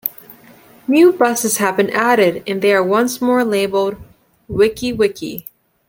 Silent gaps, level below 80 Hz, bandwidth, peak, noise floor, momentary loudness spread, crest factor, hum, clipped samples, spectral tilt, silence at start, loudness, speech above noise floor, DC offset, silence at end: none; -50 dBFS; 17 kHz; 0 dBFS; -45 dBFS; 14 LU; 16 dB; none; under 0.1%; -4 dB/octave; 0.05 s; -15 LUFS; 30 dB; under 0.1%; 0.45 s